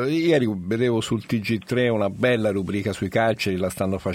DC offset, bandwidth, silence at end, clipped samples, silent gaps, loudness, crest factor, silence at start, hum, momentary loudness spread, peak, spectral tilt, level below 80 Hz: under 0.1%; 16.5 kHz; 0 s; under 0.1%; none; -23 LUFS; 16 dB; 0 s; none; 5 LU; -6 dBFS; -6 dB/octave; -54 dBFS